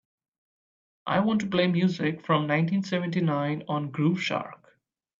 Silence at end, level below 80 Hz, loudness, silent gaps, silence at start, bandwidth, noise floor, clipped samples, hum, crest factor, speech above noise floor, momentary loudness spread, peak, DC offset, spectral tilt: 0.65 s; -68 dBFS; -26 LUFS; none; 1.05 s; 7.6 kHz; -66 dBFS; under 0.1%; none; 18 dB; 40 dB; 6 LU; -10 dBFS; under 0.1%; -7 dB/octave